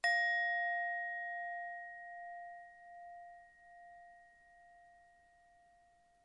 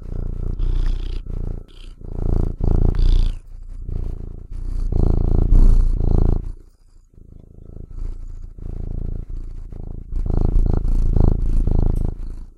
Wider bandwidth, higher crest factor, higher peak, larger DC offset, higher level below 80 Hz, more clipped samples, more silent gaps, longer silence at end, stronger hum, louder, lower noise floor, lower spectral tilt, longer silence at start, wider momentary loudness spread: first, 10.5 kHz vs 4.9 kHz; about the same, 20 dB vs 16 dB; second, -24 dBFS vs -2 dBFS; neither; second, -84 dBFS vs -18 dBFS; neither; neither; first, 1.25 s vs 0.1 s; neither; second, -38 LUFS vs -23 LUFS; first, -69 dBFS vs -48 dBFS; second, 0.5 dB/octave vs -9.5 dB/octave; about the same, 0.05 s vs 0 s; first, 26 LU vs 18 LU